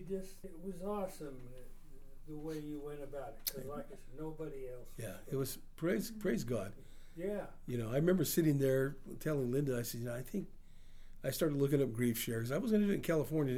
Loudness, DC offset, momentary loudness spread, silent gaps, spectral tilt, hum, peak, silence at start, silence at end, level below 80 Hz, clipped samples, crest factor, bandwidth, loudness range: -38 LUFS; under 0.1%; 16 LU; none; -6 dB/octave; none; -18 dBFS; 0 s; 0 s; -54 dBFS; under 0.1%; 20 dB; over 20 kHz; 10 LU